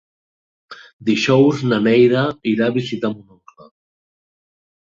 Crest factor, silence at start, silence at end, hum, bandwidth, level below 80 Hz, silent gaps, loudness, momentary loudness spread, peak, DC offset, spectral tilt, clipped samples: 16 dB; 0.7 s; 1.75 s; none; 7.6 kHz; -60 dBFS; 0.93-0.99 s; -17 LUFS; 12 LU; -2 dBFS; under 0.1%; -6.5 dB/octave; under 0.1%